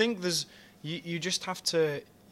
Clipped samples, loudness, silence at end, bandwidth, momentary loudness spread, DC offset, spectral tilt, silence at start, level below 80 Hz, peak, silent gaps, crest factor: under 0.1%; -31 LUFS; 0.25 s; 15.5 kHz; 12 LU; under 0.1%; -3 dB/octave; 0 s; -74 dBFS; -12 dBFS; none; 20 dB